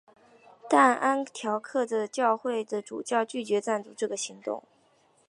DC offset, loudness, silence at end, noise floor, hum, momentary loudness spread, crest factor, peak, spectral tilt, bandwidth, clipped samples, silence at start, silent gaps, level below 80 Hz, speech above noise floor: under 0.1%; -28 LUFS; 0.7 s; -65 dBFS; none; 12 LU; 22 dB; -8 dBFS; -3.5 dB/octave; 11.5 kHz; under 0.1%; 0.65 s; none; -84 dBFS; 37 dB